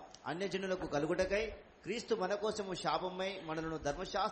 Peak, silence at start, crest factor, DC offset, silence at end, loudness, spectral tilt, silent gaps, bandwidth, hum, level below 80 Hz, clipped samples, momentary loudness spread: -20 dBFS; 0 s; 18 dB; under 0.1%; 0 s; -38 LUFS; -4.5 dB/octave; none; 8.4 kHz; none; -58 dBFS; under 0.1%; 8 LU